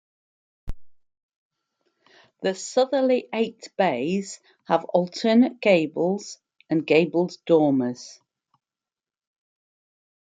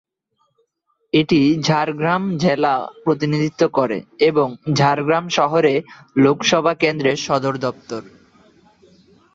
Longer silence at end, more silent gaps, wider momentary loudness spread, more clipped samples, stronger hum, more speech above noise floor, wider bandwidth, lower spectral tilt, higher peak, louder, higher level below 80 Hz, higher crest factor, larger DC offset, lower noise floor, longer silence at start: first, 2.1 s vs 1.25 s; first, 1.23-1.29 s, 1.36-1.50 s vs none; first, 19 LU vs 7 LU; neither; neither; first, over 68 dB vs 51 dB; first, 9.2 kHz vs 7.8 kHz; about the same, -5.5 dB/octave vs -5.5 dB/octave; second, -6 dBFS vs -2 dBFS; second, -23 LUFS vs -18 LUFS; first, -52 dBFS vs -58 dBFS; about the same, 20 dB vs 16 dB; neither; first, under -90 dBFS vs -68 dBFS; second, 0.65 s vs 1.15 s